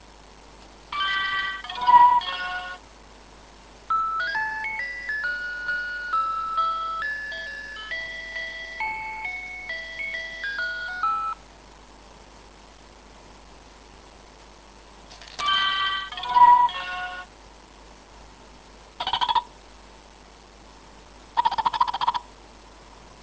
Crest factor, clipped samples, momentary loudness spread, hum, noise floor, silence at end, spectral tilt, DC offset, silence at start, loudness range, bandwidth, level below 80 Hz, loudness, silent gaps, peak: 22 dB; under 0.1%; 15 LU; none; -49 dBFS; 0 s; -1.5 dB/octave; under 0.1%; 0.05 s; 9 LU; 8 kHz; -52 dBFS; -24 LUFS; none; -4 dBFS